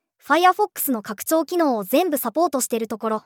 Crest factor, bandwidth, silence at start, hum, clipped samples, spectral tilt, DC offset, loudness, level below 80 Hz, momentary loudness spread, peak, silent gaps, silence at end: 18 dB; over 20 kHz; 0.25 s; none; under 0.1%; -3 dB/octave; under 0.1%; -21 LUFS; -78 dBFS; 7 LU; -4 dBFS; none; 0.05 s